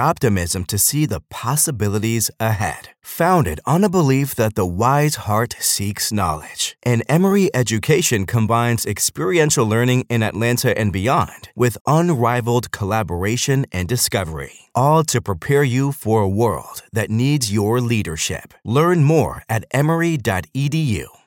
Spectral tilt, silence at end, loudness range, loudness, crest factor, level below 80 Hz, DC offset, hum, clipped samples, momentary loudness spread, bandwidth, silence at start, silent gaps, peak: -5 dB/octave; 0.2 s; 2 LU; -18 LUFS; 14 dB; -44 dBFS; under 0.1%; none; under 0.1%; 7 LU; 17 kHz; 0 s; 11.81-11.85 s; -4 dBFS